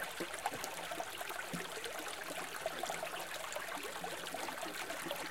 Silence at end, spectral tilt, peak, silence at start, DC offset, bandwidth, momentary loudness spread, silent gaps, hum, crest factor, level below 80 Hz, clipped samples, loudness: 0 s; -2 dB/octave; -22 dBFS; 0 s; 0.2%; 17 kHz; 2 LU; none; none; 22 dB; -74 dBFS; under 0.1%; -42 LUFS